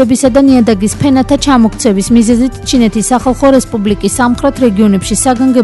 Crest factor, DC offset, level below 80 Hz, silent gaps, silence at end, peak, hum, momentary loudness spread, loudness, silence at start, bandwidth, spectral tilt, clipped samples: 8 dB; under 0.1%; -28 dBFS; none; 0 s; 0 dBFS; none; 4 LU; -9 LUFS; 0 s; 12 kHz; -5 dB/octave; 0.3%